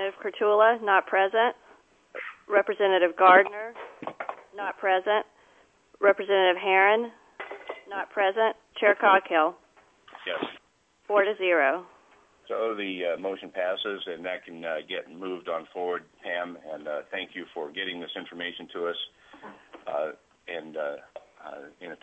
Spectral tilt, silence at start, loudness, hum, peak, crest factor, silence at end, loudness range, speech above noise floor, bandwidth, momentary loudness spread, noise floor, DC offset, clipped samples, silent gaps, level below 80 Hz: -5 dB/octave; 0 s; -26 LUFS; none; -4 dBFS; 22 dB; 0.05 s; 11 LU; 40 dB; 8 kHz; 19 LU; -66 dBFS; under 0.1%; under 0.1%; none; -78 dBFS